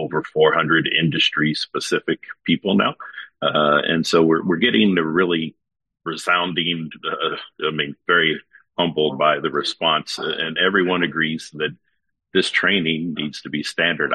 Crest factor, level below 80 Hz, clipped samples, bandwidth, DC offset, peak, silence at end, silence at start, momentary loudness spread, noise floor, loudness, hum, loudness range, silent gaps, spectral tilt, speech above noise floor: 18 dB; -62 dBFS; under 0.1%; 11.5 kHz; under 0.1%; -2 dBFS; 0 s; 0 s; 10 LU; -66 dBFS; -19 LUFS; none; 3 LU; none; -4.5 dB/octave; 46 dB